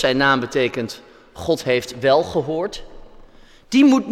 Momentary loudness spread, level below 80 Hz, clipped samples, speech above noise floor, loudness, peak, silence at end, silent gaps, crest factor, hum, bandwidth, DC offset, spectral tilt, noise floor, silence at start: 15 LU; -46 dBFS; under 0.1%; 27 dB; -19 LUFS; -4 dBFS; 0 s; none; 16 dB; none; 14 kHz; under 0.1%; -5 dB/octave; -45 dBFS; 0 s